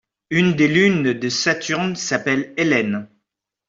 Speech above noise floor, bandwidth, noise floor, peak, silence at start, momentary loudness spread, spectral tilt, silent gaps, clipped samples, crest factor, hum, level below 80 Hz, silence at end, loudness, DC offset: 60 dB; 7.8 kHz; -78 dBFS; -2 dBFS; 0.3 s; 7 LU; -4.5 dB/octave; none; under 0.1%; 16 dB; none; -58 dBFS; 0.6 s; -19 LUFS; under 0.1%